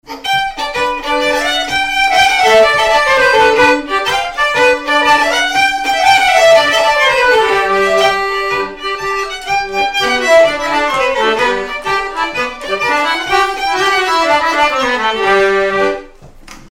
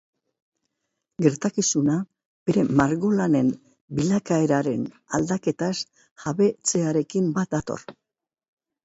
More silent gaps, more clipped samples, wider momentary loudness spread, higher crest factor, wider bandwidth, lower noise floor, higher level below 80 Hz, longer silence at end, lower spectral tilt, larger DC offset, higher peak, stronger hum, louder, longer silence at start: second, none vs 2.25-2.46 s, 3.81-3.88 s, 6.11-6.16 s; neither; second, 8 LU vs 12 LU; second, 12 dB vs 20 dB; first, 16.5 kHz vs 8.2 kHz; second, -35 dBFS vs -80 dBFS; first, -38 dBFS vs -58 dBFS; second, 0 s vs 0.9 s; second, -2 dB/octave vs -5.5 dB/octave; neither; first, 0 dBFS vs -4 dBFS; neither; first, -11 LUFS vs -23 LUFS; second, 0.1 s vs 1.2 s